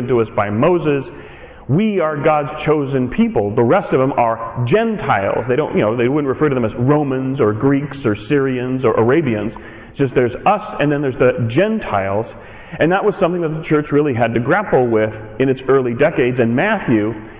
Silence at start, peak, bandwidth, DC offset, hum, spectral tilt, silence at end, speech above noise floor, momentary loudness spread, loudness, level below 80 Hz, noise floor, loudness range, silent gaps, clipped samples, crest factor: 0 s; -6 dBFS; 4 kHz; under 0.1%; none; -11.5 dB/octave; 0 s; 20 dB; 6 LU; -16 LUFS; -44 dBFS; -36 dBFS; 1 LU; none; under 0.1%; 10 dB